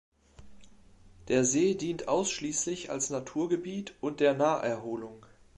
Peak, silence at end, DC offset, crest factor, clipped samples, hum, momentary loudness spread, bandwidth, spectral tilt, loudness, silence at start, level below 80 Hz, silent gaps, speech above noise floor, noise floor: -12 dBFS; 0.4 s; under 0.1%; 18 dB; under 0.1%; none; 11 LU; 11.5 kHz; -4 dB/octave; -30 LUFS; 0.4 s; -62 dBFS; none; 27 dB; -56 dBFS